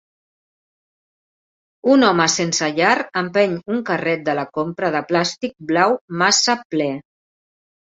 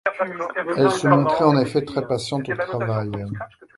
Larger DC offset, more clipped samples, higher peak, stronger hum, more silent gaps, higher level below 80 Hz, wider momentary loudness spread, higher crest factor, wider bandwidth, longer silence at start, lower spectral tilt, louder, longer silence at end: neither; neither; about the same, -2 dBFS vs 0 dBFS; neither; first, 6.01-6.08 s, 6.65-6.70 s vs none; second, -64 dBFS vs -54 dBFS; about the same, 9 LU vs 11 LU; about the same, 18 dB vs 20 dB; second, 8 kHz vs 11.5 kHz; first, 1.85 s vs 0.05 s; second, -3.5 dB/octave vs -6.5 dB/octave; first, -18 LUFS vs -21 LUFS; first, 0.9 s vs 0.3 s